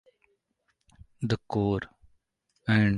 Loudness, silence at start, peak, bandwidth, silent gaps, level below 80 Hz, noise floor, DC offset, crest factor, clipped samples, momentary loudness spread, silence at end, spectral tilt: -29 LUFS; 1.2 s; -10 dBFS; 10 kHz; none; -52 dBFS; -76 dBFS; under 0.1%; 22 dB; under 0.1%; 11 LU; 0 s; -7.5 dB/octave